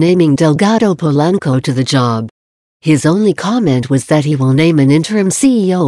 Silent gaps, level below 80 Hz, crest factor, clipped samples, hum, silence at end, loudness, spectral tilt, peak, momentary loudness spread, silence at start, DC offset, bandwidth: 2.31-2.80 s; -50 dBFS; 10 dB; under 0.1%; none; 0 s; -12 LUFS; -6 dB/octave; 0 dBFS; 4 LU; 0 s; under 0.1%; 12.5 kHz